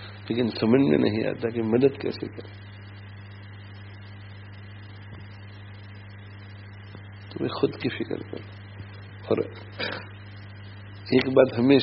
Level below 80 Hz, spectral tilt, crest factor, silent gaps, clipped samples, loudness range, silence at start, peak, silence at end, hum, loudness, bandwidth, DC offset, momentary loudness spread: -60 dBFS; -5.5 dB/octave; 24 dB; none; under 0.1%; 18 LU; 0 s; -4 dBFS; 0 s; 50 Hz at -45 dBFS; -25 LUFS; 5.8 kHz; under 0.1%; 22 LU